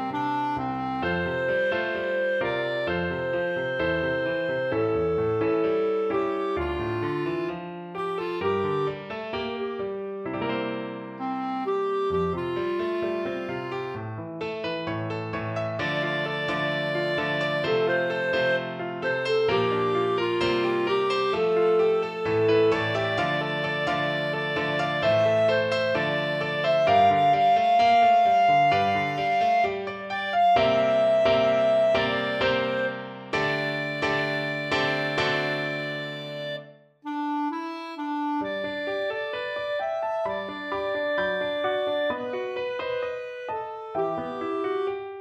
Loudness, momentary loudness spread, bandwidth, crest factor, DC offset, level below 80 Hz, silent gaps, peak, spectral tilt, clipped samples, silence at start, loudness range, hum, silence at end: -25 LUFS; 11 LU; 9 kHz; 16 dB; under 0.1%; -56 dBFS; none; -8 dBFS; -6 dB/octave; under 0.1%; 0 s; 8 LU; none; 0 s